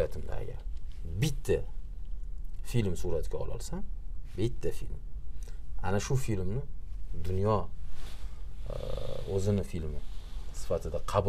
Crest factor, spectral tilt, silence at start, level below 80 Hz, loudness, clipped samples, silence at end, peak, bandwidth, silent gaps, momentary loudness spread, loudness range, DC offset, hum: 18 dB; -6.5 dB/octave; 0 s; -38 dBFS; -36 LUFS; under 0.1%; 0 s; -12 dBFS; 14 kHz; none; 15 LU; 2 LU; under 0.1%; none